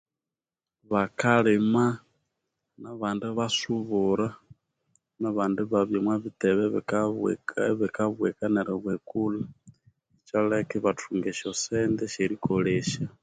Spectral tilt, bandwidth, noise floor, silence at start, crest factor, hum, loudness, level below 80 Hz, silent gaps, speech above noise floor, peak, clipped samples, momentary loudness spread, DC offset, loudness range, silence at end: -5.5 dB/octave; 9.4 kHz; under -90 dBFS; 0.9 s; 20 dB; none; -27 LUFS; -62 dBFS; none; over 64 dB; -8 dBFS; under 0.1%; 8 LU; under 0.1%; 3 LU; 0.15 s